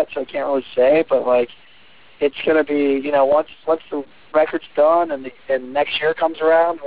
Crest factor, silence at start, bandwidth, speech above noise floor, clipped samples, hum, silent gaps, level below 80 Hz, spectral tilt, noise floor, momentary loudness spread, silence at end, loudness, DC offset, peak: 14 dB; 0 s; 4 kHz; 32 dB; under 0.1%; none; none; -58 dBFS; -8 dB/octave; -49 dBFS; 8 LU; 0 s; -18 LUFS; 0.6%; -6 dBFS